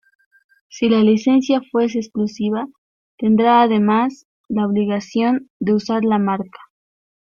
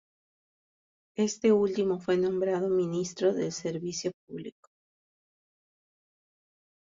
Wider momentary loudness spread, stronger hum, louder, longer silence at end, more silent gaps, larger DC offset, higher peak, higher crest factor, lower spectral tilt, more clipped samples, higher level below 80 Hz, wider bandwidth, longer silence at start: second, 10 LU vs 17 LU; neither; first, -18 LUFS vs -29 LUFS; second, 0.8 s vs 2.45 s; first, 2.78-3.18 s, 4.25-4.44 s, 5.50-5.60 s vs 4.14-4.27 s; neither; first, -2 dBFS vs -12 dBFS; about the same, 16 dB vs 18 dB; about the same, -6.5 dB/octave vs -5.5 dB/octave; neither; first, -60 dBFS vs -70 dBFS; second, 7 kHz vs 7.8 kHz; second, 0.75 s vs 1.2 s